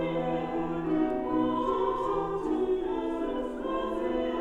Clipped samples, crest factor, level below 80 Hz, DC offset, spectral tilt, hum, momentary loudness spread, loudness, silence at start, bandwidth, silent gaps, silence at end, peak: under 0.1%; 12 dB; -48 dBFS; under 0.1%; -7.5 dB/octave; none; 4 LU; -30 LUFS; 0 s; 8.2 kHz; none; 0 s; -16 dBFS